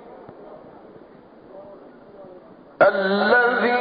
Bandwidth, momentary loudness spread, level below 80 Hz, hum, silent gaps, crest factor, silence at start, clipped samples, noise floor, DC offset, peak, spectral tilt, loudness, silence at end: 5 kHz; 26 LU; -64 dBFS; none; none; 20 dB; 0.05 s; under 0.1%; -47 dBFS; under 0.1%; -4 dBFS; -2.5 dB/octave; -18 LUFS; 0 s